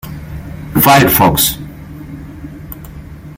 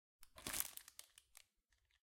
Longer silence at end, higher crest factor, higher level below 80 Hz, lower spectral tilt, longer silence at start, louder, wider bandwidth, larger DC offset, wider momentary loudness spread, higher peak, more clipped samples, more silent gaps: second, 0 s vs 0.75 s; second, 14 dB vs 38 dB; first, -34 dBFS vs -74 dBFS; first, -4 dB/octave vs -0.5 dB/octave; second, 0.05 s vs 0.2 s; first, -10 LUFS vs -46 LUFS; first, over 20 kHz vs 17 kHz; neither; about the same, 23 LU vs 22 LU; first, 0 dBFS vs -16 dBFS; neither; neither